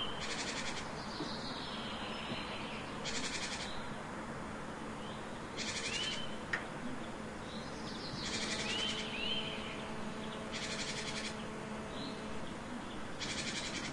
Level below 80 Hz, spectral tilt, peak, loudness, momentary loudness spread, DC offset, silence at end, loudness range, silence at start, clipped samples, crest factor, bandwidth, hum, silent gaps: -58 dBFS; -3 dB/octave; -22 dBFS; -40 LUFS; 8 LU; under 0.1%; 0 s; 3 LU; 0 s; under 0.1%; 20 dB; 11.5 kHz; none; none